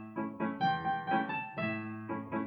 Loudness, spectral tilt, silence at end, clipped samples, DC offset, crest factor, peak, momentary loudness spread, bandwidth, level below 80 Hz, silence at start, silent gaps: -35 LUFS; -8 dB/octave; 0 s; under 0.1%; under 0.1%; 18 dB; -18 dBFS; 8 LU; 6 kHz; -70 dBFS; 0 s; none